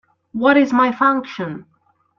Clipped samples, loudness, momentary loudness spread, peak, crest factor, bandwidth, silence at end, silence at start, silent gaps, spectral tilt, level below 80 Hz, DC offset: under 0.1%; -16 LUFS; 16 LU; -2 dBFS; 16 dB; 7.2 kHz; 0.55 s; 0.35 s; none; -6.5 dB/octave; -62 dBFS; under 0.1%